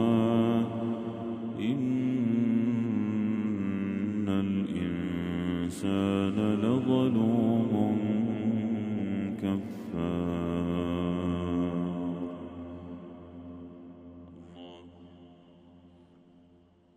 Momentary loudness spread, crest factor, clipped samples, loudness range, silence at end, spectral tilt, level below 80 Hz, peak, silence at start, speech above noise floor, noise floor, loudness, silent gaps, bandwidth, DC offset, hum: 20 LU; 16 dB; under 0.1%; 16 LU; 1.1 s; -8 dB/octave; -58 dBFS; -14 dBFS; 0 s; 34 dB; -61 dBFS; -30 LUFS; none; 10 kHz; under 0.1%; none